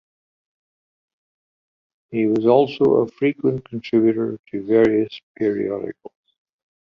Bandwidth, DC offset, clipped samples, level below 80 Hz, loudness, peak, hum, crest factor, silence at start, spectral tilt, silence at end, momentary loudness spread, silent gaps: 6.2 kHz; under 0.1%; under 0.1%; -60 dBFS; -20 LUFS; -2 dBFS; none; 20 dB; 2.1 s; -8.5 dB/octave; 0.8 s; 13 LU; 4.39-4.44 s, 5.23-5.35 s